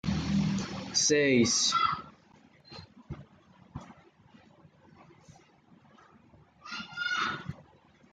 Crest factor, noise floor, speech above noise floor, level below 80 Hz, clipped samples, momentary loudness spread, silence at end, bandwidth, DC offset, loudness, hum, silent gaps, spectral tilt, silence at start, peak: 20 dB; -61 dBFS; 35 dB; -58 dBFS; under 0.1%; 25 LU; 0.5 s; 11 kHz; under 0.1%; -28 LUFS; none; none; -3 dB/octave; 0.05 s; -12 dBFS